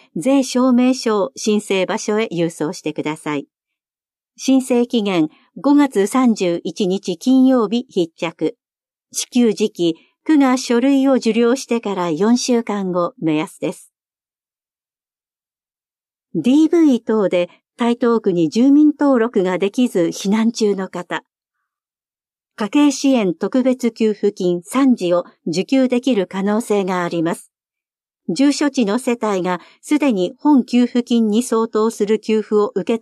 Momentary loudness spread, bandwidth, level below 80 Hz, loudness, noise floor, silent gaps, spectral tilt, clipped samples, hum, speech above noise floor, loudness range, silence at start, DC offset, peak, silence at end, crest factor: 9 LU; 13 kHz; -74 dBFS; -17 LUFS; under -90 dBFS; none; -5 dB/octave; under 0.1%; none; over 74 dB; 5 LU; 0.15 s; under 0.1%; -4 dBFS; 0.05 s; 12 dB